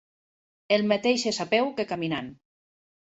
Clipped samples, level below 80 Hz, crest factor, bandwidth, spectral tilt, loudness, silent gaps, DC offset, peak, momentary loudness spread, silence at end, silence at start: under 0.1%; -68 dBFS; 20 dB; 8.4 kHz; -4 dB/octave; -26 LUFS; none; under 0.1%; -8 dBFS; 8 LU; 0.8 s; 0.7 s